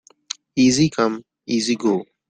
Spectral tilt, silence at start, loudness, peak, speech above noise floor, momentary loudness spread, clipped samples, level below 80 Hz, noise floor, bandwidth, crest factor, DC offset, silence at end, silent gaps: -4.5 dB/octave; 0.55 s; -19 LUFS; -4 dBFS; 19 dB; 17 LU; under 0.1%; -56 dBFS; -37 dBFS; 9.4 kHz; 16 dB; under 0.1%; 0.25 s; none